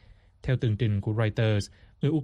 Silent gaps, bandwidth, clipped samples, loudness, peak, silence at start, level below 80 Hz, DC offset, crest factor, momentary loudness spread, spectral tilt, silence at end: none; 10.5 kHz; under 0.1%; -28 LUFS; -14 dBFS; 0.45 s; -50 dBFS; under 0.1%; 14 dB; 7 LU; -7.5 dB/octave; 0 s